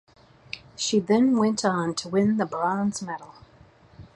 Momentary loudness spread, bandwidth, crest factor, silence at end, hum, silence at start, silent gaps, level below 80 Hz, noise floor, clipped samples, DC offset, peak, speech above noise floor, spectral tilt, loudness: 17 LU; 11 kHz; 18 dB; 0.1 s; none; 0.55 s; none; -62 dBFS; -54 dBFS; under 0.1%; under 0.1%; -8 dBFS; 30 dB; -5 dB/octave; -24 LUFS